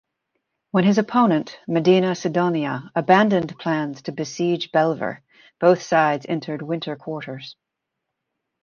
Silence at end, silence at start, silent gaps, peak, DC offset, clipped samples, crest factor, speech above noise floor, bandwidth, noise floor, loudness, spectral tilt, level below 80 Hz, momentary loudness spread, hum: 1.1 s; 0.75 s; none; -2 dBFS; under 0.1%; under 0.1%; 20 dB; 61 dB; 7 kHz; -81 dBFS; -21 LUFS; -6.5 dB/octave; -66 dBFS; 13 LU; none